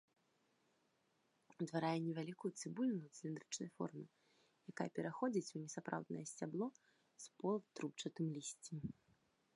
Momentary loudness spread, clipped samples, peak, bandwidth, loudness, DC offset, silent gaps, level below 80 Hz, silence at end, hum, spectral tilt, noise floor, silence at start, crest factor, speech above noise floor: 11 LU; under 0.1%; -24 dBFS; 11 kHz; -45 LUFS; under 0.1%; none; -84 dBFS; 0.65 s; none; -5.5 dB/octave; -81 dBFS; 1.5 s; 22 dB; 36 dB